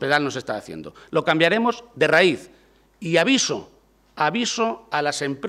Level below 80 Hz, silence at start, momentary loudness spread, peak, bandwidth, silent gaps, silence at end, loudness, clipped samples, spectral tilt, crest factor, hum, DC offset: -62 dBFS; 0 s; 14 LU; -4 dBFS; 15 kHz; none; 0 s; -21 LUFS; under 0.1%; -3.5 dB/octave; 18 dB; none; under 0.1%